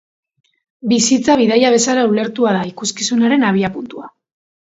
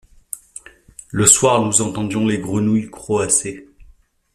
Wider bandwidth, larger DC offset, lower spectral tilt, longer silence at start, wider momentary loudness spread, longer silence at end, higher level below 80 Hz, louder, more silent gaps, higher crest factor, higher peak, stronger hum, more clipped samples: second, 8 kHz vs 15.5 kHz; neither; about the same, -4 dB/octave vs -3.5 dB/octave; first, 0.85 s vs 0.35 s; second, 13 LU vs 21 LU; about the same, 0.6 s vs 0.7 s; second, -56 dBFS vs -48 dBFS; about the same, -14 LUFS vs -16 LUFS; neither; about the same, 16 dB vs 20 dB; about the same, 0 dBFS vs 0 dBFS; neither; neither